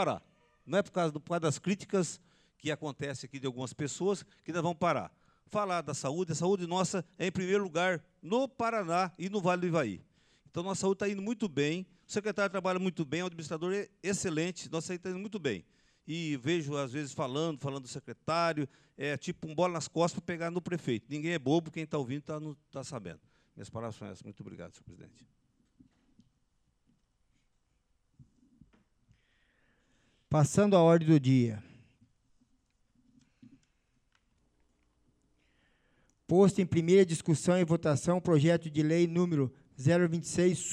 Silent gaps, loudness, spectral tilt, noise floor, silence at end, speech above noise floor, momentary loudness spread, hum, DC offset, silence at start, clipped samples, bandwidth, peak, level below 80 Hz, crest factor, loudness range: none; -32 LUFS; -6 dB/octave; -75 dBFS; 0 s; 44 dB; 15 LU; none; under 0.1%; 0 s; under 0.1%; 11.5 kHz; -14 dBFS; -68 dBFS; 20 dB; 8 LU